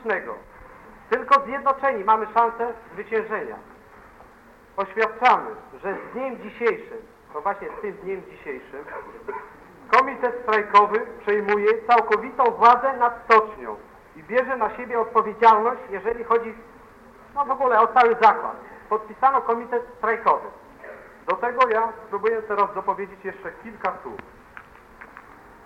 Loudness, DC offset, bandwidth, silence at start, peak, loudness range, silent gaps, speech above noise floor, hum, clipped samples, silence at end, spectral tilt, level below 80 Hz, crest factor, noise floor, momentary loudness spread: -21 LUFS; under 0.1%; 8.4 kHz; 0 s; -2 dBFS; 9 LU; none; 28 dB; none; under 0.1%; 0.45 s; -5 dB/octave; -58 dBFS; 20 dB; -50 dBFS; 19 LU